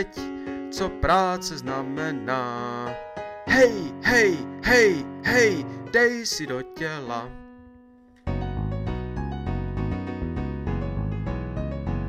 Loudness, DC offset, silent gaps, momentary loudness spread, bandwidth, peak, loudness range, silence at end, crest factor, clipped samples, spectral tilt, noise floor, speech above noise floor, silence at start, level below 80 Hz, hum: -25 LUFS; under 0.1%; none; 14 LU; 15.5 kHz; -6 dBFS; 11 LU; 0 s; 18 dB; under 0.1%; -5 dB/octave; -52 dBFS; 29 dB; 0 s; -38 dBFS; none